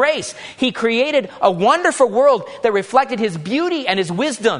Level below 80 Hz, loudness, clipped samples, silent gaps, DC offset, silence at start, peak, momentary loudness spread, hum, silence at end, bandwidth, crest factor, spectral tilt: -62 dBFS; -17 LUFS; under 0.1%; none; under 0.1%; 0 s; -2 dBFS; 7 LU; none; 0 s; 11 kHz; 16 dB; -4 dB/octave